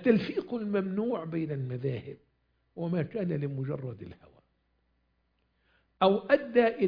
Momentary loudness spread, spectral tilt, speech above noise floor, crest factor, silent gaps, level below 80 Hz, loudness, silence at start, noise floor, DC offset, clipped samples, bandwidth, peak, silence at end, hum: 15 LU; -9.5 dB/octave; 45 dB; 22 dB; none; -68 dBFS; -30 LUFS; 0 s; -74 dBFS; under 0.1%; under 0.1%; 5.2 kHz; -10 dBFS; 0 s; 60 Hz at -55 dBFS